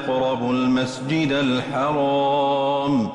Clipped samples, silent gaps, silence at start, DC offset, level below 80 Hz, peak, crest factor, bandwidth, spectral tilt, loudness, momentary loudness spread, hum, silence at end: under 0.1%; none; 0 s; under 0.1%; -56 dBFS; -12 dBFS; 10 dB; 11 kHz; -6 dB/octave; -21 LUFS; 3 LU; none; 0 s